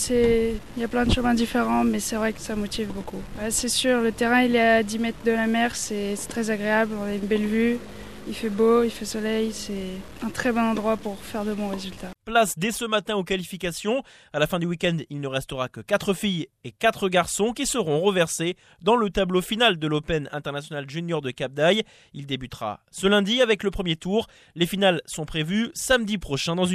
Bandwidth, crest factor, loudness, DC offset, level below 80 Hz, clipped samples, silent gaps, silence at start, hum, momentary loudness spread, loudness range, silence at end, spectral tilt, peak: 14.5 kHz; 18 dB; -24 LUFS; under 0.1%; -44 dBFS; under 0.1%; none; 0 s; none; 11 LU; 4 LU; 0 s; -4 dB/octave; -6 dBFS